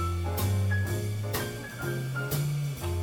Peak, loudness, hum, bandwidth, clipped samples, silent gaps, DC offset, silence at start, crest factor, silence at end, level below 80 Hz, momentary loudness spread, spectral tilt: -16 dBFS; -31 LUFS; none; 19 kHz; under 0.1%; none; under 0.1%; 0 s; 14 dB; 0 s; -46 dBFS; 6 LU; -5.5 dB/octave